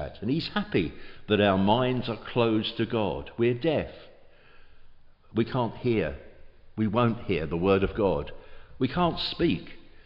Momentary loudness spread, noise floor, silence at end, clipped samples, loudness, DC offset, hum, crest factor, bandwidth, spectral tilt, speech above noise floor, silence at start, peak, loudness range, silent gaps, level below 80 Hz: 10 LU; -51 dBFS; 0.05 s; under 0.1%; -27 LUFS; under 0.1%; none; 18 dB; 5.6 kHz; -9 dB/octave; 25 dB; 0 s; -8 dBFS; 4 LU; none; -48 dBFS